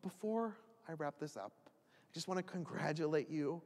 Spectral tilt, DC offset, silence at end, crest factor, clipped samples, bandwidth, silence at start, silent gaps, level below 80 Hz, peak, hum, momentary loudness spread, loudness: -6 dB/octave; under 0.1%; 0 s; 18 dB; under 0.1%; 14.5 kHz; 0.05 s; none; under -90 dBFS; -24 dBFS; none; 14 LU; -42 LUFS